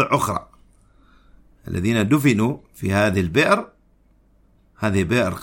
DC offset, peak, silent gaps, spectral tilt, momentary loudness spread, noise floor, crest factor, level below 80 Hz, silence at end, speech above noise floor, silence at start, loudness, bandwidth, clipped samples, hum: under 0.1%; -2 dBFS; none; -6 dB/octave; 11 LU; -57 dBFS; 20 dB; -48 dBFS; 0 s; 38 dB; 0 s; -20 LUFS; 16.5 kHz; under 0.1%; none